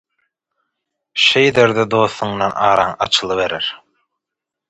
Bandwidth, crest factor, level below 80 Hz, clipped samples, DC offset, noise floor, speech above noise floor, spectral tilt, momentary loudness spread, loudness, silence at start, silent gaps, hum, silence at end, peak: 10.5 kHz; 18 dB; -52 dBFS; under 0.1%; under 0.1%; -83 dBFS; 68 dB; -3.5 dB/octave; 9 LU; -15 LUFS; 1.15 s; none; none; 0.95 s; 0 dBFS